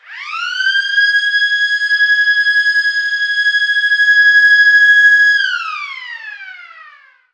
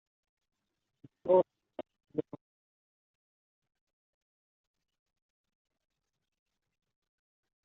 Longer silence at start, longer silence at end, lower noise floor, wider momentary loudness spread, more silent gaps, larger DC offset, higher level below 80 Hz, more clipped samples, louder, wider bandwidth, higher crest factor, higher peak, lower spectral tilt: second, 0.1 s vs 1.25 s; second, 0.55 s vs 5.45 s; second, -43 dBFS vs under -90 dBFS; second, 18 LU vs 21 LU; neither; neither; second, under -90 dBFS vs -84 dBFS; neither; first, -10 LUFS vs -32 LUFS; first, 8.8 kHz vs 3.9 kHz; second, 12 dB vs 26 dB; first, -2 dBFS vs -14 dBFS; second, 9.5 dB/octave vs -8 dB/octave